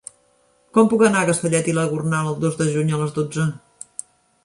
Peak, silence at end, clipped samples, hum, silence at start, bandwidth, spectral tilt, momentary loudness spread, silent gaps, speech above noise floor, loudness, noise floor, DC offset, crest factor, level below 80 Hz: -2 dBFS; 0.9 s; under 0.1%; none; 0.75 s; 11.5 kHz; -5.5 dB/octave; 18 LU; none; 41 dB; -20 LUFS; -60 dBFS; under 0.1%; 18 dB; -60 dBFS